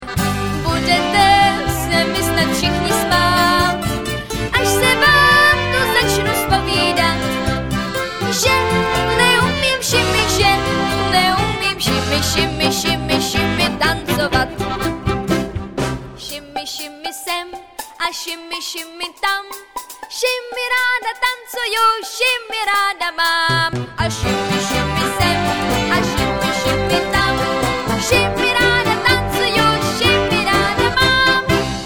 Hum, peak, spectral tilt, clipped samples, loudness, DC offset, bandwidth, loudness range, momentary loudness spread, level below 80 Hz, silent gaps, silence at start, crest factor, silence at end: none; 0 dBFS; -3.5 dB/octave; under 0.1%; -16 LUFS; 0.5%; over 20 kHz; 9 LU; 10 LU; -34 dBFS; none; 0 s; 16 dB; 0 s